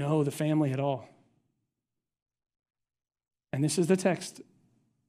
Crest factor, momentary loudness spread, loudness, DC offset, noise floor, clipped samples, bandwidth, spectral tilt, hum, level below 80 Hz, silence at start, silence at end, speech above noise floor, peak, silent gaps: 20 dB; 12 LU; -29 LUFS; under 0.1%; -88 dBFS; under 0.1%; 15 kHz; -6 dB/octave; none; -74 dBFS; 0 s; 0.65 s; 59 dB; -12 dBFS; 2.22-2.26 s